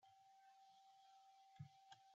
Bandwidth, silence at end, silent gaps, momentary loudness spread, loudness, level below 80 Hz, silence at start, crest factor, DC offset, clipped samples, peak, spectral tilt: 7.4 kHz; 0 s; none; 7 LU; -67 LUFS; under -90 dBFS; 0 s; 22 dB; under 0.1%; under 0.1%; -46 dBFS; -4 dB/octave